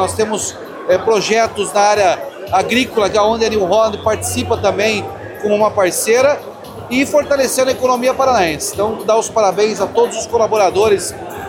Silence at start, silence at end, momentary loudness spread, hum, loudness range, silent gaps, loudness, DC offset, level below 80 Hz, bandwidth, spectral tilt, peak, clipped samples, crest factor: 0 s; 0 s; 7 LU; none; 1 LU; none; -15 LUFS; under 0.1%; -46 dBFS; 17 kHz; -3.5 dB/octave; -2 dBFS; under 0.1%; 12 dB